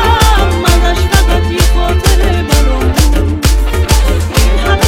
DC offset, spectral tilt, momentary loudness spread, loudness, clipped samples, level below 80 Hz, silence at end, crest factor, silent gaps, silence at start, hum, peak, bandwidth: under 0.1%; -4.5 dB/octave; 2 LU; -11 LUFS; 0.2%; -10 dBFS; 0 s; 8 dB; none; 0 s; none; 0 dBFS; 17 kHz